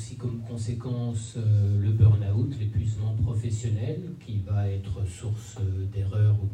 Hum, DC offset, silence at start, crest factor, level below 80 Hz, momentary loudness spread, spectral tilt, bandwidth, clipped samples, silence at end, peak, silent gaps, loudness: none; under 0.1%; 0 s; 18 dB; -48 dBFS; 12 LU; -8 dB/octave; 9.2 kHz; under 0.1%; 0 s; -8 dBFS; none; -27 LUFS